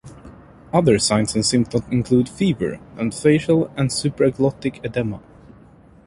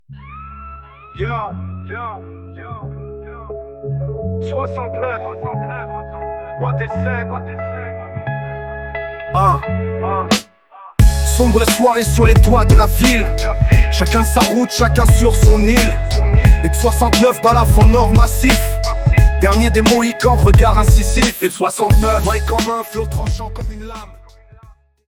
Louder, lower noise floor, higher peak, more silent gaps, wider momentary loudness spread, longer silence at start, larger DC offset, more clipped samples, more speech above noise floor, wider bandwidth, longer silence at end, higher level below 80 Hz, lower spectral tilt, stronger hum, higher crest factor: second, -20 LUFS vs -14 LUFS; about the same, -48 dBFS vs -45 dBFS; about the same, -2 dBFS vs 0 dBFS; neither; second, 10 LU vs 18 LU; about the same, 0.05 s vs 0.1 s; neither; neither; about the same, 29 dB vs 32 dB; second, 11.5 kHz vs 18 kHz; about the same, 0.85 s vs 0.9 s; second, -46 dBFS vs -18 dBFS; about the same, -5.5 dB/octave vs -5.5 dB/octave; neither; about the same, 18 dB vs 14 dB